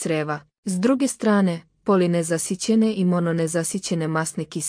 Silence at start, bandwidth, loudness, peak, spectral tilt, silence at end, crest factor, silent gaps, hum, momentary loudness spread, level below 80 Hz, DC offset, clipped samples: 0 s; 10.5 kHz; -22 LUFS; -6 dBFS; -5.5 dB/octave; 0 s; 14 dB; 0.58-0.63 s; none; 7 LU; -64 dBFS; under 0.1%; under 0.1%